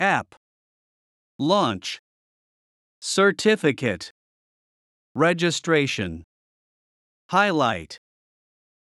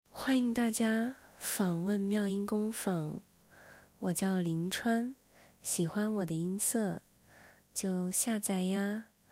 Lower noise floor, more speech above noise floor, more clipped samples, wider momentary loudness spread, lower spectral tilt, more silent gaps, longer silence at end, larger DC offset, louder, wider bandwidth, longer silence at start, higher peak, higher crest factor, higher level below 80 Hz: first, under -90 dBFS vs -61 dBFS; first, over 68 dB vs 28 dB; neither; first, 18 LU vs 9 LU; about the same, -4.5 dB/octave vs -4.5 dB/octave; first, 0.37-1.39 s, 1.99-3.01 s, 4.11-5.15 s, 6.24-7.29 s vs none; first, 1.05 s vs 0.25 s; neither; first, -22 LUFS vs -34 LUFS; second, 12 kHz vs 16 kHz; second, 0 s vs 0.15 s; first, -6 dBFS vs -20 dBFS; about the same, 20 dB vs 16 dB; first, -64 dBFS vs -70 dBFS